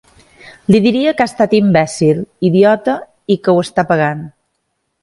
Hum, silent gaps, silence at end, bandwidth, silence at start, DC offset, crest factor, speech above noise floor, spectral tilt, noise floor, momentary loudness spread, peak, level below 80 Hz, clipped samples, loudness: none; none; 0.75 s; 11.5 kHz; 0.45 s; under 0.1%; 14 dB; 56 dB; -6.5 dB/octave; -69 dBFS; 9 LU; 0 dBFS; -52 dBFS; under 0.1%; -13 LUFS